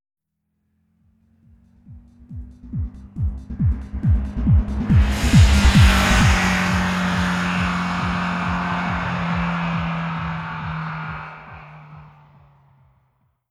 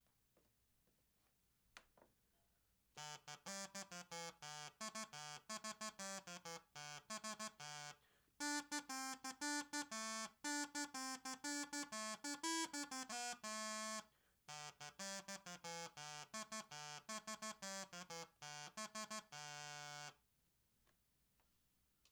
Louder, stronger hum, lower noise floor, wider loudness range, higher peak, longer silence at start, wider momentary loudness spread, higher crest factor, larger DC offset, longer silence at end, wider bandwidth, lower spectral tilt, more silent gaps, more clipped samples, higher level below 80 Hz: first, -20 LUFS vs -49 LUFS; neither; second, -73 dBFS vs -82 dBFS; first, 15 LU vs 8 LU; first, -2 dBFS vs -30 dBFS; first, 1.9 s vs 1.75 s; first, 19 LU vs 9 LU; about the same, 18 dB vs 20 dB; neither; second, 1.45 s vs 1.95 s; second, 14.5 kHz vs over 20 kHz; first, -5.5 dB/octave vs -1.5 dB/octave; neither; neither; first, -26 dBFS vs -88 dBFS